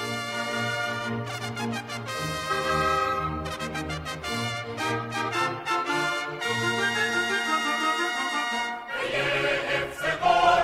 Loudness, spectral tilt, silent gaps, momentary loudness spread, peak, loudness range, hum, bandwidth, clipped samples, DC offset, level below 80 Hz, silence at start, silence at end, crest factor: -27 LUFS; -3.5 dB/octave; none; 7 LU; -8 dBFS; 3 LU; none; 16 kHz; under 0.1%; under 0.1%; -52 dBFS; 0 s; 0 s; 20 dB